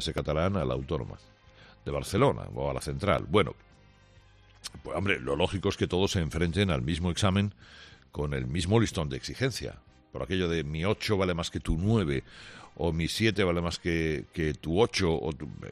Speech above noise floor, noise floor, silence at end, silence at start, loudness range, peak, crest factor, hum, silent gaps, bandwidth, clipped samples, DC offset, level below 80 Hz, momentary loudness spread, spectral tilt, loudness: 29 dB; -57 dBFS; 0 s; 0 s; 2 LU; -10 dBFS; 20 dB; none; none; 13.5 kHz; under 0.1%; under 0.1%; -46 dBFS; 14 LU; -5.5 dB/octave; -29 LUFS